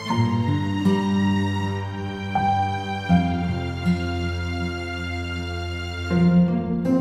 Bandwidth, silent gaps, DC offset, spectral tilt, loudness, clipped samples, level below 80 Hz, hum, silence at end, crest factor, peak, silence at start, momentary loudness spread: 10 kHz; none; under 0.1%; -7.5 dB/octave; -23 LUFS; under 0.1%; -46 dBFS; none; 0 s; 16 dB; -6 dBFS; 0 s; 9 LU